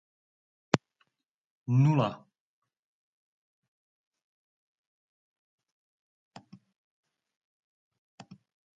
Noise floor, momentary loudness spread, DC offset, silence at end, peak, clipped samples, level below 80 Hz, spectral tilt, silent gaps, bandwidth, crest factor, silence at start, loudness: -75 dBFS; 18 LU; under 0.1%; 6.6 s; -2 dBFS; under 0.1%; -74 dBFS; -7 dB/octave; 1.31-1.66 s; 7.6 kHz; 34 dB; 0.75 s; -28 LUFS